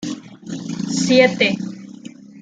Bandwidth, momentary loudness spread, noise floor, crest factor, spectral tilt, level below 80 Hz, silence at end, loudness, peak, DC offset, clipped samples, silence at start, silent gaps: 9.4 kHz; 24 LU; -38 dBFS; 18 dB; -4 dB/octave; -60 dBFS; 0 s; -17 LUFS; -2 dBFS; under 0.1%; under 0.1%; 0 s; none